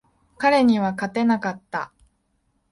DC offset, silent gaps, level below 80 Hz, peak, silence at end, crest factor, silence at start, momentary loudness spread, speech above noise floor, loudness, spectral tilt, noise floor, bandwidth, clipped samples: under 0.1%; none; -60 dBFS; -6 dBFS; 0.85 s; 16 dB; 0.4 s; 13 LU; 48 dB; -21 LUFS; -6 dB/octave; -69 dBFS; 11.5 kHz; under 0.1%